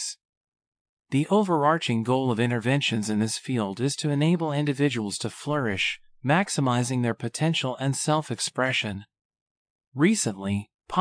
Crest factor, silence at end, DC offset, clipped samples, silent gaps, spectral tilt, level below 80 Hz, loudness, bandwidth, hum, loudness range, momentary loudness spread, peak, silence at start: 18 dB; 0 s; under 0.1%; under 0.1%; 0.25-0.41 s, 0.48-0.52 s, 0.67-0.72 s, 0.81-0.97 s, 9.25-9.30 s, 9.41-9.79 s, 9.87-9.92 s, 10.74-10.79 s; -5 dB/octave; -66 dBFS; -25 LUFS; 10.5 kHz; none; 2 LU; 8 LU; -8 dBFS; 0 s